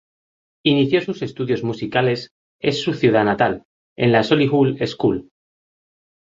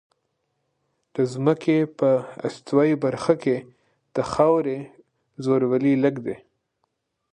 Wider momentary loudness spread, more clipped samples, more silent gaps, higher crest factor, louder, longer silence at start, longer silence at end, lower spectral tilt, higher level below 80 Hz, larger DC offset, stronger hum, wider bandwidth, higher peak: about the same, 10 LU vs 12 LU; neither; first, 2.31-2.59 s, 3.65-3.96 s vs none; about the same, 18 dB vs 20 dB; first, -19 LUFS vs -22 LUFS; second, 0.65 s vs 1.15 s; first, 1.1 s vs 0.95 s; about the same, -6.5 dB/octave vs -7.5 dB/octave; first, -54 dBFS vs -62 dBFS; neither; neither; second, 7.6 kHz vs 9.8 kHz; about the same, -2 dBFS vs -4 dBFS